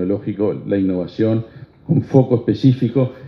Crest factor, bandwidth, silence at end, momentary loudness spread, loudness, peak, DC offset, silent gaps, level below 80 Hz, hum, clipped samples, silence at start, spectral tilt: 18 dB; 6 kHz; 0 s; 7 LU; -18 LUFS; 0 dBFS; under 0.1%; none; -56 dBFS; none; under 0.1%; 0 s; -10 dB/octave